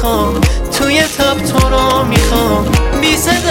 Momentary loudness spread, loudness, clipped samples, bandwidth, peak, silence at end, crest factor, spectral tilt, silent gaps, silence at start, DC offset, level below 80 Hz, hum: 3 LU; -12 LUFS; under 0.1%; 17 kHz; 0 dBFS; 0 s; 12 dB; -4.5 dB/octave; none; 0 s; under 0.1%; -18 dBFS; none